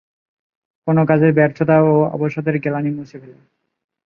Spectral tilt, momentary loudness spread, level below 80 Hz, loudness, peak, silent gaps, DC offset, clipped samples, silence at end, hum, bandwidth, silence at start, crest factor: -10.5 dB/octave; 13 LU; -60 dBFS; -16 LUFS; 0 dBFS; none; under 0.1%; under 0.1%; 0.75 s; none; 5.2 kHz; 0.85 s; 16 dB